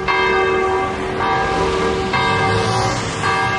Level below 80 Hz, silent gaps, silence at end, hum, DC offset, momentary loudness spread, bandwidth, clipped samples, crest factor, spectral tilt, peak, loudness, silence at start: -36 dBFS; none; 0 s; none; under 0.1%; 4 LU; 11.5 kHz; under 0.1%; 14 dB; -4.5 dB/octave; -4 dBFS; -17 LUFS; 0 s